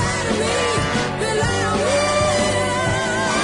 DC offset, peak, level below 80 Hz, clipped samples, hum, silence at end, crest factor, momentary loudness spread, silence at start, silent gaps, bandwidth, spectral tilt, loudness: under 0.1%; -6 dBFS; -38 dBFS; under 0.1%; none; 0 s; 12 dB; 3 LU; 0 s; none; 11 kHz; -4 dB/octave; -19 LUFS